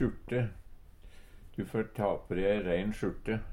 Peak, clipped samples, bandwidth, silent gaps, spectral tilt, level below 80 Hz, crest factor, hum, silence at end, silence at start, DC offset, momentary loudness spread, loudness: -16 dBFS; under 0.1%; 16 kHz; none; -8 dB/octave; -48 dBFS; 18 dB; none; 0 s; 0 s; under 0.1%; 7 LU; -34 LUFS